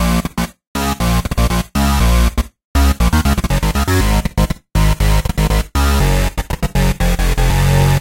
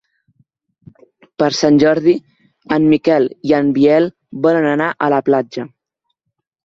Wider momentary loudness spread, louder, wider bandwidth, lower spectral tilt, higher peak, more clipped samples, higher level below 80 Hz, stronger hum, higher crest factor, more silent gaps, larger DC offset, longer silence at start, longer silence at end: second, 6 LU vs 9 LU; about the same, -16 LUFS vs -14 LUFS; first, 17 kHz vs 7.6 kHz; about the same, -5.5 dB/octave vs -6 dB/octave; about the same, 0 dBFS vs 0 dBFS; neither; first, -16 dBFS vs -54 dBFS; neither; about the same, 12 dB vs 14 dB; first, 0.67-0.75 s, 2.65-2.75 s vs none; neither; second, 0 s vs 1.4 s; second, 0 s vs 1 s